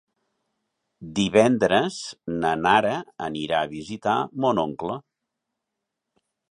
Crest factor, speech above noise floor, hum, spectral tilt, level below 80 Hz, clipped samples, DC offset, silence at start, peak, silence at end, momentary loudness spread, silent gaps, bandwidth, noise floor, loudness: 22 dB; 60 dB; none; -5 dB/octave; -58 dBFS; under 0.1%; under 0.1%; 1 s; -4 dBFS; 1.5 s; 13 LU; none; 11.5 kHz; -83 dBFS; -23 LUFS